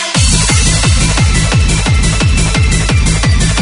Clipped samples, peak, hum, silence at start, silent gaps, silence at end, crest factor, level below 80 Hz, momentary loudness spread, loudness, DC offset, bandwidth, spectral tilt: under 0.1%; 0 dBFS; none; 0 s; none; 0 s; 10 dB; -14 dBFS; 2 LU; -10 LUFS; under 0.1%; 11 kHz; -3.5 dB/octave